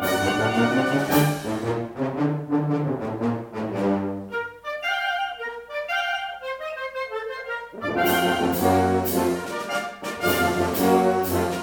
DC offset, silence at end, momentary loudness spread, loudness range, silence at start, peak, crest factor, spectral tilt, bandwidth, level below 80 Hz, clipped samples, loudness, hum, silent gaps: under 0.1%; 0 s; 11 LU; 6 LU; 0 s; -6 dBFS; 18 dB; -5 dB/octave; over 20 kHz; -54 dBFS; under 0.1%; -24 LUFS; none; none